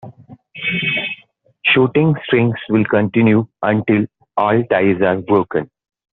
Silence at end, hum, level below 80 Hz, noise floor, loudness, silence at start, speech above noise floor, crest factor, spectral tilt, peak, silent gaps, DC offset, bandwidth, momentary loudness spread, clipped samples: 0.5 s; none; -54 dBFS; -49 dBFS; -16 LUFS; 0.05 s; 34 dB; 16 dB; -5 dB/octave; 0 dBFS; none; under 0.1%; 4.1 kHz; 9 LU; under 0.1%